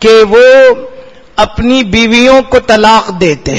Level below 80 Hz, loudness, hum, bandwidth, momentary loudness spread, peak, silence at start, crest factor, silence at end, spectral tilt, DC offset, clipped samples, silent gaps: -30 dBFS; -6 LUFS; none; 12 kHz; 9 LU; 0 dBFS; 0 s; 6 dB; 0 s; -4.5 dB/octave; under 0.1%; 4%; none